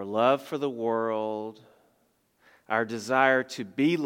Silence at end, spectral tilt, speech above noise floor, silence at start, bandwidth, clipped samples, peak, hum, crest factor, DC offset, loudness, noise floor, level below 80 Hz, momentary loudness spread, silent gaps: 0 s; -5.5 dB/octave; 43 dB; 0 s; 16.5 kHz; under 0.1%; -6 dBFS; none; 22 dB; under 0.1%; -27 LUFS; -69 dBFS; -82 dBFS; 11 LU; none